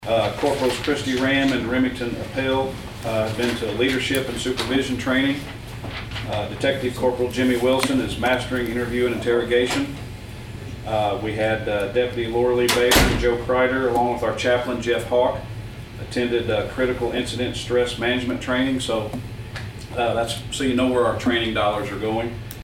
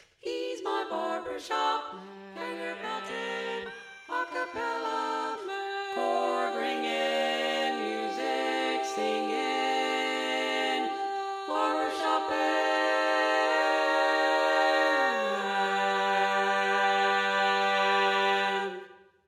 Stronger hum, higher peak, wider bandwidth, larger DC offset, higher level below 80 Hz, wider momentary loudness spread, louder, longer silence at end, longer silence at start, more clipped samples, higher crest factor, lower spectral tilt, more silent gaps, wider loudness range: neither; first, -2 dBFS vs -12 dBFS; about the same, 16.5 kHz vs 15 kHz; neither; first, -38 dBFS vs -78 dBFS; about the same, 11 LU vs 10 LU; first, -22 LUFS vs -28 LUFS; second, 0 s vs 0.3 s; second, 0 s vs 0.25 s; neither; about the same, 20 dB vs 16 dB; first, -4.5 dB/octave vs -2.5 dB/octave; neither; second, 4 LU vs 8 LU